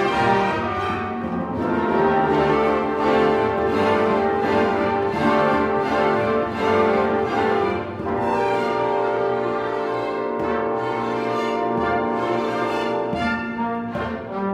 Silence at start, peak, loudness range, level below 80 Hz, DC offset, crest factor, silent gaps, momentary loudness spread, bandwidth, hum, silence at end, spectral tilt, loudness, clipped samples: 0 s; -6 dBFS; 4 LU; -48 dBFS; under 0.1%; 16 dB; none; 6 LU; 11 kHz; none; 0 s; -6.5 dB/octave; -21 LUFS; under 0.1%